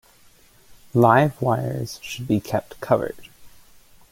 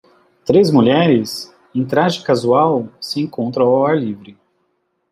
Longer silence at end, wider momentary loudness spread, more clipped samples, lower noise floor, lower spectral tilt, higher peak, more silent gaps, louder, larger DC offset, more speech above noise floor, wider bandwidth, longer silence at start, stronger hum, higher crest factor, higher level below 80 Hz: second, 0.65 s vs 0.8 s; about the same, 15 LU vs 13 LU; neither; second, -53 dBFS vs -67 dBFS; about the same, -7 dB/octave vs -6.5 dB/octave; about the same, -2 dBFS vs -2 dBFS; neither; second, -22 LUFS vs -16 LUFS; neither; second, 32 dB vs 52 dB; first, 17 kHz vs 15 kHz; first, 0.95 s vs 0.45 s; neither; first, 22 dB vs 14 dB; about the same, -54 dBFS vs -58 dBFS